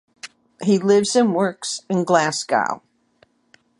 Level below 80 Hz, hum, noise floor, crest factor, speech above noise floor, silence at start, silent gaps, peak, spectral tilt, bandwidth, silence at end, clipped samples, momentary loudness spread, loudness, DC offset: -68 dBFS; none; -59 dBFS; 20 dB; 41 dB; 0.25 s; none; -2 dBFS; -4.5 dB/octave; 11.5 kHz; 1 s; under 0.1%; 19 LU; -19 LUFS; under 0.1%